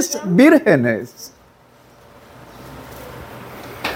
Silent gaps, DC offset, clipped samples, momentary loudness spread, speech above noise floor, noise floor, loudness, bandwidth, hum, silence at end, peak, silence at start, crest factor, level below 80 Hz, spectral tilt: none; under 0.1%; under 0.1%; 26 LU; 35 dB; -49 dBFS; -14 LUFS; 17 kHz; none; 0 s; 0 dBFS; 0 s; 20 dB; -52 dBFS; -5 dB/octave